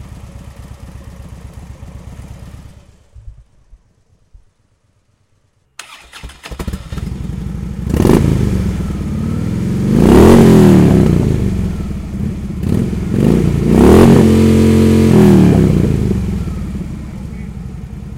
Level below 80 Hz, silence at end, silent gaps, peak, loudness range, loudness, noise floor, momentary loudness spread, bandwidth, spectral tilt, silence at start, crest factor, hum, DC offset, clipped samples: -24 dBFS; 0 s; none; 0 dBFS; 17 LU; -11 LUFS; -57 dBFS; 27 LU; 16.5 kHz; -8 dB/octave; 0 s; 12 dB; none; under 0.1%; 0.6%